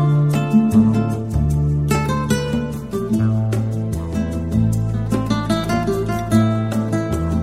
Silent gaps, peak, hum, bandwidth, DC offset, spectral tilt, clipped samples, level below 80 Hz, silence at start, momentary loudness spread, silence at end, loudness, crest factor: none; -2 dBFS; none; 15.5 kHz; 0.5%; -7.5 dB/octave; under 0.1%; -32 dBFS; 0 s; 7 LU; 0 s; -19 LUFS; 14 dB